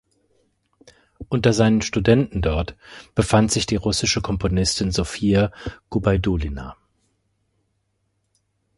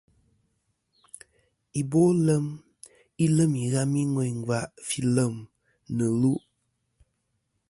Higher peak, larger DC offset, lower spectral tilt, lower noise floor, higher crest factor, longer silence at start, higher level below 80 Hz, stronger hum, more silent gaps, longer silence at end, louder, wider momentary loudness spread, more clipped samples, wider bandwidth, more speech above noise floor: first, 0 dBFS vs -10 dBFS; neither; second, -5 dB/octave vs -6.5 dB/octave; second, -71 dBFS vs -76 dBFS; about the same, 22 dB vs 18 dB; second, 1.2 s vs 1.75 s; first, -36 dBFS vs -62 dBFS; neither; neither; first, 2.05 s vs 1.3 s; first, -20 LUFS vs -26 LUFS; second, 11 LU vs 15 LU; neither; about the same, 11.5 kHz vs 11.5 kHz; about the same, 51 dB vs 52 dB